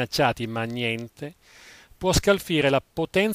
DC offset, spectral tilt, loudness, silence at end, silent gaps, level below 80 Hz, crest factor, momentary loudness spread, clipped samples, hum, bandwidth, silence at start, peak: under 0.1%; -4.5 dB/octave; -24 LUFS; 0 s; none; -40 dBFS; 18 dB; 14 LU; under 0.1%; none; 16 kHz; 0 s; -6 dBFS